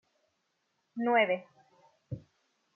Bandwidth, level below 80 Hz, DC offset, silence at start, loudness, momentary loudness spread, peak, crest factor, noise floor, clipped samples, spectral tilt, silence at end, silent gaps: 6.4 kHz; -72 dBFS; under 0.1%; 0.95 s; -29 LUFS; 19 LU; -14 dBFS; 22 dB; -79 dBFS; under 0.1%; -3 dB/octave; 0.55 s; none